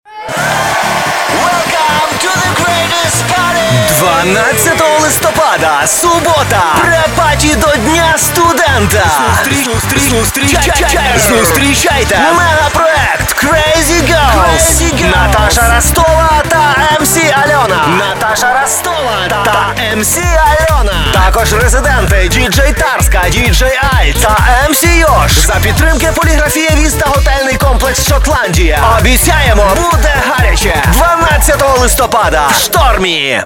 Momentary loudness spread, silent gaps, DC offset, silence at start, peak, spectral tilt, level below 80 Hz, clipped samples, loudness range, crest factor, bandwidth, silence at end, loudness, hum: 3 LU; none; 0.4%; 0.1 s; 0 dBFS; -3.5 dB/octave; -16 dBFS; 0.1%; 2 LU; 8 dB; 18 kHz; 0 s; -8 LUFS; none